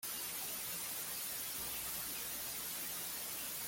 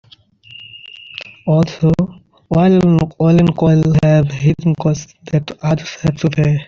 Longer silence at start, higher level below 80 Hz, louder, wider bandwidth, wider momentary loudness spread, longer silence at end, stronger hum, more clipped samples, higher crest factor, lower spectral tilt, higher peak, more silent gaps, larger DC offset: second, 0 s vs 0.6 s; second, -68 dBFS vs -40 dBFS; second, -40 LUFS vs -14 LUFS; first, 17 kHz vs 7 kHz; second, 1 LU vs 19 LU; about the same, 0 s vs 0.05 s; neither; neither; about the same, 14 dB vs 12 dB; second, 0 dB/octave vs -8 dB/octave; second, -30 dBFS vs -2 dBFS; neither; neither